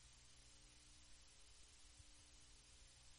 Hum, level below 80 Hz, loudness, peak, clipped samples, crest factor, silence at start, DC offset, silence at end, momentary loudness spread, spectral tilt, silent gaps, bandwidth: 60 Hz at -75 dBFS; -72 dBFS; -66 LUFS; -50 dBFS; under 0.1%; 16 dB; 0 s; under 0.1%; 0 s; 1 LU; -1.5 dB/octave; none; 10.5 kHz